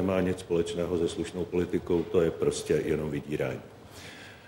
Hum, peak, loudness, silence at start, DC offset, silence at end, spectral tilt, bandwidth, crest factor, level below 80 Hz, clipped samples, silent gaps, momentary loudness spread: none; -12 dBFS; -29 LUFS; 0 s; under 0.1%; 0 s; -6 dB/octave; 16 kHz; 18 dB; -52 dBFS; under 0.1%; none; 17 LU